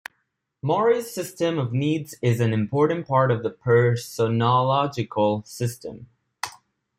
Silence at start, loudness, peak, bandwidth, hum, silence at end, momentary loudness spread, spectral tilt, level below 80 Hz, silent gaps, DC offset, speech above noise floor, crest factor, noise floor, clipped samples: 0.65 s; -23 LUFS; -6 dBFS; 15.5 kHz; none; 0.5 s; 15 LU; -6.5 dB/octave; -62 dBFS; none; under 0.1%; 52 dB; 16 dB; -74 dBFS; under 0.1%